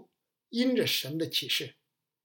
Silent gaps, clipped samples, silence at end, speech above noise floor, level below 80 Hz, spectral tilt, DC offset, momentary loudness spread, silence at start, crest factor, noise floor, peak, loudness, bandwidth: none; under 0.1%; 0.55 s; 39 dB; -86 dBFS; -3.5 dB/octave; under 0.1%; 8 LU; 0.5 s; 16 dB; -68 dBFS; -16 dBFS; -29 LUFS; 17 kHz